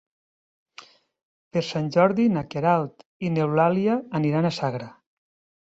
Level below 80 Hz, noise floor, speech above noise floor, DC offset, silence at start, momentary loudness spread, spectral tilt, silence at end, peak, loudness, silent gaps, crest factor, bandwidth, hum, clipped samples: -62 dBFS; -50 dBFS; 27 dB; under 0.1%; 1.55 s; 10 LU; -7.5 dB/octave; 0.8 s; -6 dBFS; -23 LUFS; 3.06-3.20 s; 20 dB; 8 kHz; none; under 0.1%